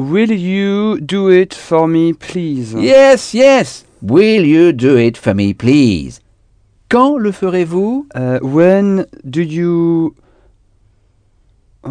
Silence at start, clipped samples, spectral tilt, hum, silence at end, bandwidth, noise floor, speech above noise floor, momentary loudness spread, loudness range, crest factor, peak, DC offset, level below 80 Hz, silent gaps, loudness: 0 s; 0.4%; -6.5 dB/octave; none; 0 s; 10 kHz; -53 dBFS; 42 dB; 10 LU; 5 LU; 12 dB; 0 dBFS; under 0.1%; -46 dBFS; none; -12 LUFS